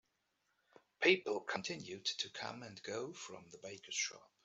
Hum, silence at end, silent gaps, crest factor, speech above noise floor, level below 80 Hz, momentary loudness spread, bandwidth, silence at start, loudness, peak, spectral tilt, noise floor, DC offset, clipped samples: none; 0.25 s; none; 28 dB; 42 dB; -86 dBFS; 19 LU; 8.2 kHz; 1 s; -39 LUFS; -14 dBFS; -2.5 dB/octave; -83 dBFS; under 0.1%; under 0.1%